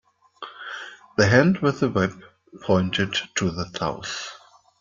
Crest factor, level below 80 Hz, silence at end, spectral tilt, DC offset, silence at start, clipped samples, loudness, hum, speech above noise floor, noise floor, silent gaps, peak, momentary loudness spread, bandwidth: 22 dB; -56 dBFS; 0.45 s; -5 dB/octave; under 0.1%; 0.4 s; under 0.1%; -23 LUFS; none; 21 dB; -43 dBFS; none; -2 dBFS; 19 LU; 7.6 kHz